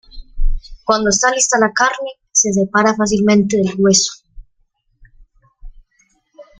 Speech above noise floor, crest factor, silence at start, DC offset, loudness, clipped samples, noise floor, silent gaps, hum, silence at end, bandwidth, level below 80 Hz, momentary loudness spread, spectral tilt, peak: 48 dB; 16 dB; 0.15 s; under 0.1%; -14 LUFS; under 0.1%; -62 dBFS; none; none; 0.2 s; 9.6 kHz; -28 dBFS; 14 LU; -3 dB/octave; 0 dBFS